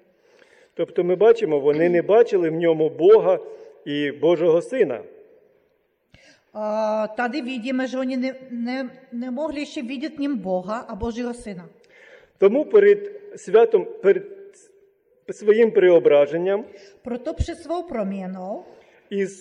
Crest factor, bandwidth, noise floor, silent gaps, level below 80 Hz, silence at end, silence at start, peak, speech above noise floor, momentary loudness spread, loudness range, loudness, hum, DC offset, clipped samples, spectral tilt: 16 dB; 10 kHz; -66 dBFS; none; -46 dBFS; 0.05 s; 0.8 s; -6 dBFS; 46 dB; 17 LU; 9 LU; -21 LUFS; none; under 0.1%; under 0.1%; -6.5 dB/octave